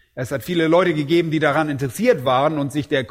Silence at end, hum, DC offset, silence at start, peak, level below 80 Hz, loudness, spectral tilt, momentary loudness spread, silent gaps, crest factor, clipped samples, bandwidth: 0.05 s; none; under 0.1%; 0.15 s; -4 dBFS; -54 dBFS; -19 LUFS; -6 dB/octave; 7 LU; none; 16 dB; under 0.1%; 16.5 kHz